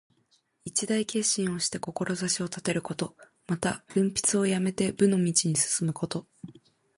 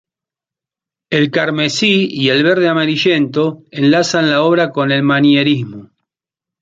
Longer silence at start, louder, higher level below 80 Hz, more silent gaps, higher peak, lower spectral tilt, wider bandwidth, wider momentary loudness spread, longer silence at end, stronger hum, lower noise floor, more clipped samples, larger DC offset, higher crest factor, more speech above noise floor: second, 0.65 s vs 1.1 s; second, -27 LUFS vs -13 LUFS; second, -64 dBFS vs -58 dBFS; neither; second, -10 dBFS vs 0 dBFS; about the same, -4 dB/octave vs -5 dB/octave; first, 11.5 kHz vs 7.8 kHz; first, 11 LU vs 5 LU; second, 0.45 s vs 0.75 s; neither; second, -69 dBFS vs -87 dBFS; neither; neither; about the same, 18 dB vs 14 dB; second, 41 dB vs 74 dB